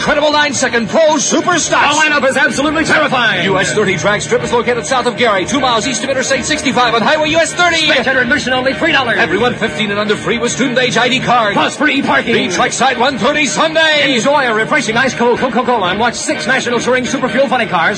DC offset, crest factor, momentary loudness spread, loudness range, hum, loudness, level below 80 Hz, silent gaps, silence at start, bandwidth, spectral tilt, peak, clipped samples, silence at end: under 0.1%; 12 dB; 4 LU; 2 LU; none; -12 LUFS; -44 dBFS; none; 0 s; 10.5 kHz; -3 dB/octave; 0 dBFS; under 0.1%; 0 s